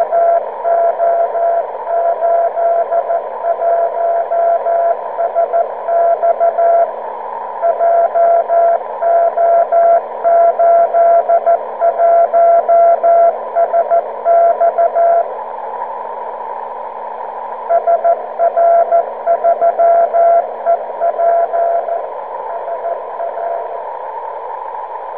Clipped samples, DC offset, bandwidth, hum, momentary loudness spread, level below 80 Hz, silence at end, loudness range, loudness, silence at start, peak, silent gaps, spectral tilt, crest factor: under 0.1%; 0.5%; 3.4 kHz; none; 14 LU; -70 dBFS; 0 s; 7 LU; -13 LUFS; 0 s; -2 dBFS; none; -8.5 dB/octave; 12 dB